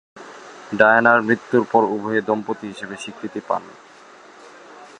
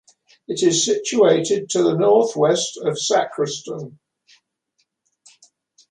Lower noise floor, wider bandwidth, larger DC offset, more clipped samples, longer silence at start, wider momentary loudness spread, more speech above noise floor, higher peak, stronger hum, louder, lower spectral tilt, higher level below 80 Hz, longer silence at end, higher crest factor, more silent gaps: second, -45 dBFS vs -70 dBFS; about the same, 10.5 kHz vs 11 kHz; neither; neither; second, 0.15 s vs 0.5 s; first, 21 LU vs 13 LU; second, 26 dB vs 52 dB; first, 0 dBFS vs -4 dBFS; neither; about the same, -18 LUFS vs -18 LUFS; first, -6 dB/octave vs -4 dB/octave; about the same, -66 dBFS vs -68 dBFS; second, 0.15 s vs 2 s; about the same, 20 dB vs 18 dB; neither